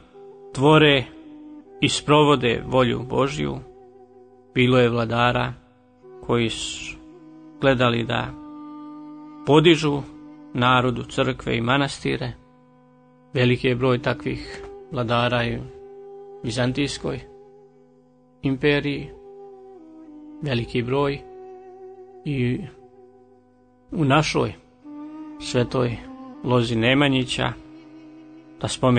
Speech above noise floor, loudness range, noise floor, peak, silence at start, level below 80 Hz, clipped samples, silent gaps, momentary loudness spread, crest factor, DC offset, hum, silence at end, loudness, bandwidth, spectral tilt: 36 dB; 7 LU; -56 dBFS; -4 dBFS; 0.15 s; -48 dBFS; under 0.1%; none; 23 LU; 20 dB; under 0.1%; none; 0 s; -22 LUFS; 9.6 kHz; -5.5 dB/octave